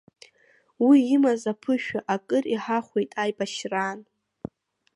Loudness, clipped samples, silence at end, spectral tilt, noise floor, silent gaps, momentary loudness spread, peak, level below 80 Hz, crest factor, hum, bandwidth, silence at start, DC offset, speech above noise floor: -24 LUFS; under 0.1%; 0.95 s; -5 dB/octave; -62 dBFS; none; 23 LU; -8 dBFS; -70 dBFS; 18 dB; none; 11 kHz; 0.8 s; under 0.1%; 39 dB